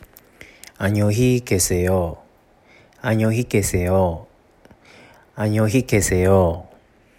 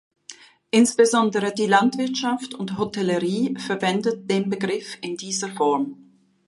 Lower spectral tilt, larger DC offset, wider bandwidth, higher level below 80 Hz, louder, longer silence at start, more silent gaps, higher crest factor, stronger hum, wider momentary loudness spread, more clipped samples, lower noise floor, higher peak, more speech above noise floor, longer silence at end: about the same, -5.5 dB/octave vs -4.5 dB/octave; neither; first, 16.5 kHz vs 11.5 kHz; first, -42 dBFS vs -68 dBFS; first, -19 LUFS vs -22 LUFS; first, 0.8 s vs 0.3 s; neither; about the same, 18 dB vs 20 dB; neither; about the same, 10 LU vs 11 LU; neither; first, -53 dBFS vs -46 dBFS; about the same, -4 dBFS vs -4 dBFS; first, 35 dB vs 25 dB; about the same, 0.55 s vs 0.55 s